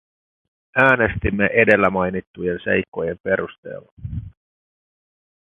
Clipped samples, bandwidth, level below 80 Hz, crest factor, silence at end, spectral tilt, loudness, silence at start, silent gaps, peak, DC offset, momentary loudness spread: under 0.1%; 9 kHz; -40 dBFS; 22 dB; 1.15 s; -8 dB/octave; -19 LUFS; 0.75 s; 2.27-2.34 s, 2.88-2.92 s, 3.20-3.24 s, 3.58-3.63 s, 3.92-3.97 s; 0 dBFS; under 0.1%; 18 LU